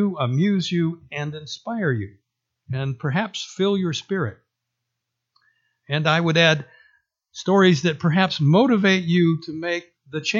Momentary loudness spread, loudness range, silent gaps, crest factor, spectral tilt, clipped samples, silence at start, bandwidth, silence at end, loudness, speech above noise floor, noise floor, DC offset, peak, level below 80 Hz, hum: 13 LU; 8 LU; none; 20 dB; -6 dB/octave; under 0.1%; 0 s; 7.6 kHz; 0 s; -21 LUFS; 60 dB; -81 dBFS; under 0.1%; -2 dBFS; -64 dBFS; none